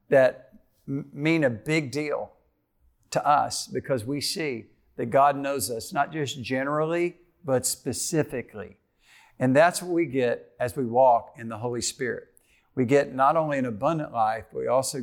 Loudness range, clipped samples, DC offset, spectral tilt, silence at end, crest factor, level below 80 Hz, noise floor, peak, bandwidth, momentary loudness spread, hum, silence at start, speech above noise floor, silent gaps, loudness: 3 LU; under 0.1%; under 0.1%; -4.5 dB/octave; 0 s; 16 dB; -64 dBFS; -67 dBFS; -8 dBFS; 19.5 kHz; 13 LU; none; 0.1 s; 42 dB; none; -25 LUFS